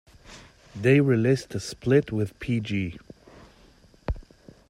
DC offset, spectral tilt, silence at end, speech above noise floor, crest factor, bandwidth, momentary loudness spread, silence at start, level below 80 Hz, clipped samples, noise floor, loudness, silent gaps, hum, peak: under 0.1%; -7 dB/octave; 0.5 s; 32 dB; 18 dB; 12.5 kHz; 18 LU; 0.3 s; -46 dBFS; under 0.1%; -55 dBFS; -25 LUFS; none; none; -8 dBFS